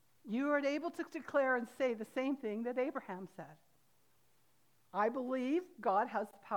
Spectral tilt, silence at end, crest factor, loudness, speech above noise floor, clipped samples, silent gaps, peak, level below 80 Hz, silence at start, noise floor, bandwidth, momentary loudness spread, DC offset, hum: -5.5 dB/octave; 0 s; 16 dB; -37 LUFS; 38 dB; under 0.1%; none; -22 dBFS; -90 dBFS; 0.25 s; -75 dBFS; 19.5 kHz; 11 LU; under 0.1%; none